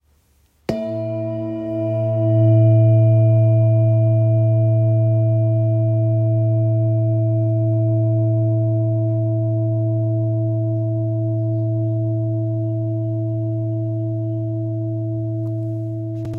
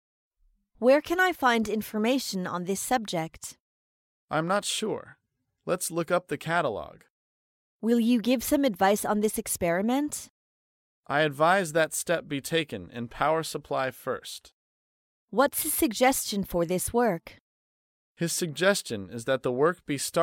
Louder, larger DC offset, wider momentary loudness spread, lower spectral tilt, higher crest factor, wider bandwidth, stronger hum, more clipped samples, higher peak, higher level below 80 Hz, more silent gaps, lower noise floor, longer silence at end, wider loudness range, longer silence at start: first, -19 LUFS vs -27 LUFS; neither; about the same, 10 LU vs 11 LU; first, -12 dB/octave vs -4 dB/octave; second, 12 dB vs 20 dB; second, 2.5 kHz vs 17 kHz; neither; neither; about the same, -6 dBFS vs -8 dBFS; about the same, -54 dBFS vs -58 dBFS; second, none vs 3.60-4.28 s, 7.10-7.80 s, 10.30-11.03 s, 14.53-15.28 s, 17.40-18.15 s; second, -58 dBFS vs -66 dBFS; about the same, 0 s vs 0 s; about the same, 7 LU vs 5 LU; about the same, 0.7 s vs 0.8 s